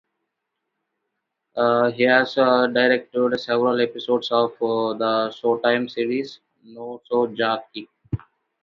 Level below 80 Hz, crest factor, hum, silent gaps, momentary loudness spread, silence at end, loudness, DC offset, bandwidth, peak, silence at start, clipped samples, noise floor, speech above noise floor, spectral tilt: -56 dBFS; 20 dB; none; none; 15 LU; 0.45 s; -21 LUFS; under 0.1%; 7 kHz; -4 dBFS; 1.55 s; under 0.1%; -79 dBFS; 59 dB; -6.5 dB/octave